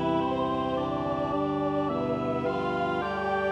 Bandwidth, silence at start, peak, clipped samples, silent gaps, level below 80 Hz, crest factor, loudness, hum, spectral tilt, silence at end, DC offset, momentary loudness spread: 9.4 kHz; 0 s; -16 dBFS; under 0.1%; none; -52 dBFS; 12 dB; -28 LUFS; none; -7.5 dB/octave; 0 s; under 0.1%; 2 LU